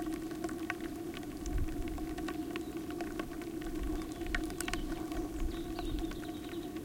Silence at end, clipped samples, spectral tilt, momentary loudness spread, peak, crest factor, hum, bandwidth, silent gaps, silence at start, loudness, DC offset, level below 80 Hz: 0 s; under 0.1%; -5 dB/octave; 4 LU; -14 dBFS; 24 dB; none; 17 kHz; none; 0 s; -40 LUFS; under 0.1%; -44 dBFS